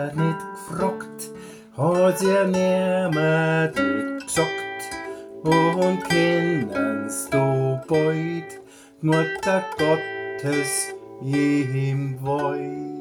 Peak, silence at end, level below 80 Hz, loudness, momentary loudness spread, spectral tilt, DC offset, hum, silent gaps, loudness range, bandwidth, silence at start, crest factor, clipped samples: -6 dBFS; 0 s; -58 dBFS; -23 LUFS; 13 LU; -5.5 dB/octave; under 0.1%; none; none; 3 LU; 19.5 kHz; 0 s; 16 dB; under 0.1%